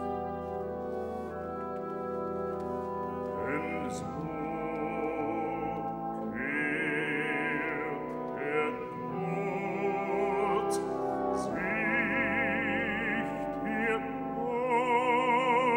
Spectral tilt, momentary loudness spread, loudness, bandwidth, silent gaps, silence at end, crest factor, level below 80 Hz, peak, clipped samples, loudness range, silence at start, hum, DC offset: -6 dB/octave; 9 LU; -32 LUFS; 16.5 kHz; none; 0 s; 16 dB; -60 dBFS; -16 dBFS; under 0.1%; 6 LU; 0 s; none; under 0.1%